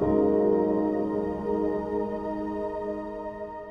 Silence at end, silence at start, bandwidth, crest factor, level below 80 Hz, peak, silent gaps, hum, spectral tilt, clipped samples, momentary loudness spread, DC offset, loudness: 0 s; 0 s; 5.8 kHz; 14 dB; -50 dBFS; -12 dBFS; none; none; -10 dB/octave; under 0.1%; 12 LU; under 0.1%; -28 LUFS